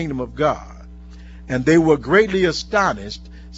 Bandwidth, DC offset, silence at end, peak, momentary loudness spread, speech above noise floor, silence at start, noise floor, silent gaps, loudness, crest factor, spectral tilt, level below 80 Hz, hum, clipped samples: 8 kHz; under 0.1%; 0 s; 0 dBFS; 15 LU; 20 dB; 0 s; -38 dBFS; none; -18 LUFS; 18 dB; -5.5 dB/octave; -38 dBFS; none; under 0.1%